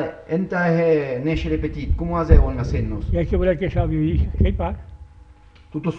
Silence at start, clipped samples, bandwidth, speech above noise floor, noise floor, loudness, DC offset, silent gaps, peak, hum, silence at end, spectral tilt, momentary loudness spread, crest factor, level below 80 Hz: 0 s; under 0.1%; 6.6 kHz; 28 dB; -47 dBFS; -21 LUFS; under 0.1%; none; 0 dBFS; none; 0 s; -9 dB/octave; 8 LU; 20 dB; -24 dBFS